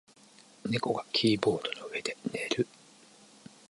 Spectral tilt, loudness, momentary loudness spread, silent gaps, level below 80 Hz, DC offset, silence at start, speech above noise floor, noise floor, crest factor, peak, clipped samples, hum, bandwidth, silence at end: -4.5 dB/octave; -31 LUFS; 9 LU; none; -70 dBFS; under 0.1%; 0.65 s; 27 dB; -58 dBFS; 24 dB; -10 dBFS; under 0.1%; none; 11.5 kHz; 1.05 s